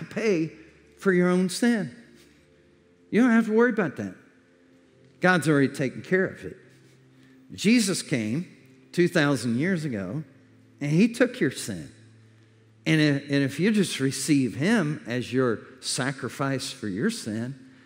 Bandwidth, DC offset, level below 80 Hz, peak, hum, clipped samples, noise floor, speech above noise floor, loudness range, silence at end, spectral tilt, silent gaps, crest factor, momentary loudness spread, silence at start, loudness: 16 kHz; under 0.1%; -72 dBFS; -6 dBFS; none; under 0.1%; -58 dBFS; 34 dB; 3 LU; 0.2 s; -5.5 dB/octave; none; 20 dB; 13 LU; 0 s; -25 LUFS